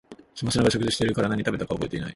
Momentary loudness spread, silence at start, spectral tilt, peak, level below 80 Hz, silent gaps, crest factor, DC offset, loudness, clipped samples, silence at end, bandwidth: 8 LU; 0.1 s; -5 dB/octave; -4 dBFS; -48 dBFS; none; 20 dB; under 0.1%; -25 LUFS; under 0.1%; 0 s; 11.5 kHz